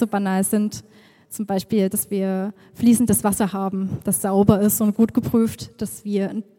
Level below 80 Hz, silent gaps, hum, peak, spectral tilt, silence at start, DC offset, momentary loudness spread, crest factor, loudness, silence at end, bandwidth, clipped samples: -52 dBFS; none; none; 0 dBFS; -6 dB/octave; 0 s; under 0.1%; 13 LU; 20 dB; -20 LUFS; 0.15 s; 17 kHz; under 0.1%